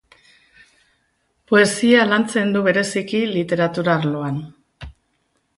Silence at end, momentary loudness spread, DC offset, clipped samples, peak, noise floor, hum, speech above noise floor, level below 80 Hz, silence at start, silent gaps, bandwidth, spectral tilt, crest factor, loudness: 0.65 s; 8 LU; under 0.1%; under 0.1%; -2 dBFS; -68 dBFS; none; 50 dB; -52 dBFS; 1.5 s; none; 11.5 kHz; -5 dB/octave; 18 dB; -18 LUFS